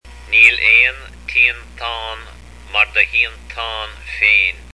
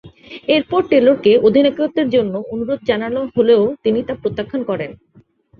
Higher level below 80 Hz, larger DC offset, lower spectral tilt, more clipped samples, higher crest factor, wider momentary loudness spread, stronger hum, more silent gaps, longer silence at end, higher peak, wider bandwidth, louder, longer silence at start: first, -38 dBFS vs -52 dBFS; first, 0.4% vs under 0.1%; second, -1.5 dB/octave vs -8 dB/octave; neither; about the same, 16 dB vs 14 dB; first, 17 LU vs 11 LU; first, 60 Hz at -40 dBFS vs none; neither; second, 0 s vs 0.65 s; about the same, 0 dBFS vs -2 dBFS; first, 11 kHz vs 5 kHz; first, -12 LUFS vs -16 LUFS; about the same, 0.05 s vs 0.05 s